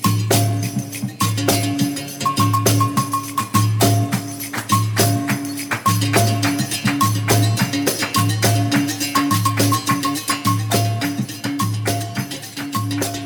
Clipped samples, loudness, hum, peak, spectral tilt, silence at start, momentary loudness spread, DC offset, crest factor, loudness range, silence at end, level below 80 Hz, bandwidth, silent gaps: under 0.1%; -19 LUFS; none; 0 dBFS; -4.5 dB/octave; 0 s; 8 LU; under 0.1%; 18 dB; 2 LU; 0 s; -50 dBFS; 19.5 kHz; none